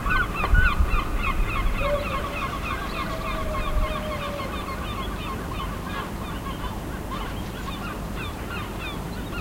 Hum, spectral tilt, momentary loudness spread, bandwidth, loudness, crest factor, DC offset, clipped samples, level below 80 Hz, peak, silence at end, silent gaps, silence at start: none; -5.5 dB/octave; 9 LU; 16 kHz; -28 LUFS; 20 dB; under 0.1%; under 0.1%; -30 dBFS; -6 dBFS; 0 s; none; 0 s